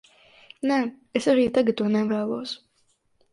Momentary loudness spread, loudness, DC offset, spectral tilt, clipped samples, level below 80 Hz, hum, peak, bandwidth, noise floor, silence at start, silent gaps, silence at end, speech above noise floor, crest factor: 11 LU; -24 LUFS; under 0.1%; -5.5 dB/octave; under 0.1%; -64 dBFS; none; -6 dBFS; 11.5 kHz; -67 dBFS; 0.65 s; none; 0.75 s; 44 dB; 20 dB